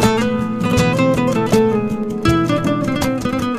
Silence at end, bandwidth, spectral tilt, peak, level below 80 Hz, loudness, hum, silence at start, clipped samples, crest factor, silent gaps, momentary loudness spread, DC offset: 0 s; 15.5 kHz; -6 dB/octave; -2 dBFS; -36 dBFS; -17 LUFS; none; 0 s; under 0.1%; 14 dB; none; 4 LU; under 0.1%